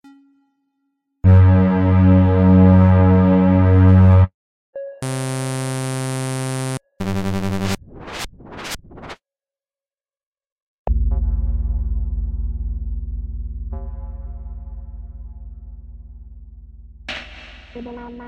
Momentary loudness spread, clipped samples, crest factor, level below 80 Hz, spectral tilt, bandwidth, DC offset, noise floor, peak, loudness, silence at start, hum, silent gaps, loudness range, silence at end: 24 LU; under 0.1%; 16 dB; -28 dBFS; -7.5 dB/octave; 12 kHz; under 0.1%; under -90 dBFS; -4 dBFS; -17 LUFS; 1.25 s; none; 4.34-4.73 s, 10.26-10.32 s, 10.52-10.85 s; 23 LU; 0 s